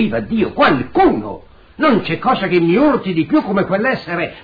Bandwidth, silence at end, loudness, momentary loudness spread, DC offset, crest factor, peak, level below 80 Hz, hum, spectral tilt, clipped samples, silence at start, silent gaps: 5 kHz; 0 s; -15 LUFS; 7 LU; 0.8%; 12 dB; -2 dBFS; -44 dBFS; none; -9 dB/octave; under 0.1%; 0 s; none